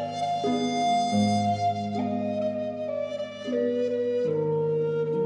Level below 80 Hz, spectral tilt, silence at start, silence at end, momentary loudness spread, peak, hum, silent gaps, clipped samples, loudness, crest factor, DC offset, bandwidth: -70 dBFS; -6 dB/octave; 0 s; 0 s; 7 LU; -12 dBFS; none; none; under 0.1%; -27 LUFS; 14 dB; under 0.1%; 9.8 kHz